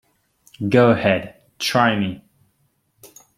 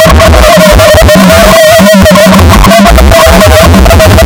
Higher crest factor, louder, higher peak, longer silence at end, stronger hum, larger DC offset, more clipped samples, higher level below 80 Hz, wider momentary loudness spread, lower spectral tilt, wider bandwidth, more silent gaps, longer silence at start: first, 20 dB vs 0 dB; second, -19 LUFS vs -1 LUFS; about the same, -2 dBFS vs 0 dBFS; first, 0.3 s vs 0 s; neither; neither; second, under 0.1% vs 50%; second, -56 dBFS vs -8 dBFS; first, 16 LU vs 1 LU; about the same, -5.5 dB/octave vs -5 dB/octave; second, 16 kHz vs over 20 kHz; neither; first, 0.6 s vs 0 s